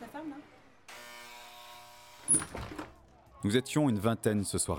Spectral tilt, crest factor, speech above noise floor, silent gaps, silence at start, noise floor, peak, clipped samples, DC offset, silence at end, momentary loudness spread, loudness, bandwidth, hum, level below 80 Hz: -4 dB/octave; 20 dB; 28 dB; none; 0 s; -57 dBFS; -14 dBFS; under 0.1%; under 0.1%; 0 s; 22 LU; -31 LUFS; 18 kHz; none; -60 dBFS